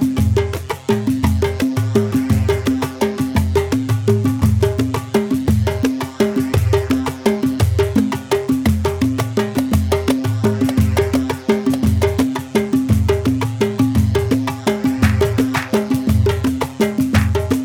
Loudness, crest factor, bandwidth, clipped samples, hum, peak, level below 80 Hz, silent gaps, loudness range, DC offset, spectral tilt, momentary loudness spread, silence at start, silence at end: -17 LUFS; 14 dB; 18 kHz; under 0.1%; none; -2 dBFS; -30 dBFS; none; 1 LU; under 0.1%; -7 dB/octave; 4 LU; 0 s; 0 s